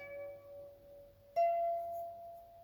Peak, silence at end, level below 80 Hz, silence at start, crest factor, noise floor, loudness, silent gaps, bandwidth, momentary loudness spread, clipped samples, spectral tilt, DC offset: -24 dBFS; 0 s; -74 dBFS; 0 s; 16 dB; -58 dBFS; -38 LUFS; none; over 20 kHz; 24 LU; under 0.1%; -5 dB/octave; under 0.1%